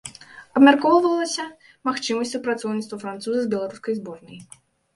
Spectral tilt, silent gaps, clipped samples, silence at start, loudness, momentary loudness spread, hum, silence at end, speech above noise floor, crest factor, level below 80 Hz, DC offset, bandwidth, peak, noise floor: -4 dB/octave; none; under 0.1%; 0.05 s; -22 LUFS; 17 LU; none; 0.55 s; 21 dB; 22 dB; -68 dBFS; under 0.1%; 11.5 kHz; 0 dBFS; -42 dBFS